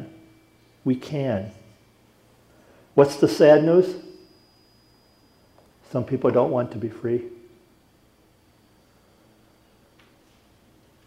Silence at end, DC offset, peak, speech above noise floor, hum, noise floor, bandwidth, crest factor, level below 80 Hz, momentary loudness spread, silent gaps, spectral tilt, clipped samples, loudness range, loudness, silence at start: 3.75 s; under 0.1%; -4 dBFS; 39 dB; none; -59 dBFS; 15 kHz; 22 dB; -66 dBFS; 16 LU; none; -7 dB/octave; under 0.1%; 10 LU; -21 LUFS; 0 s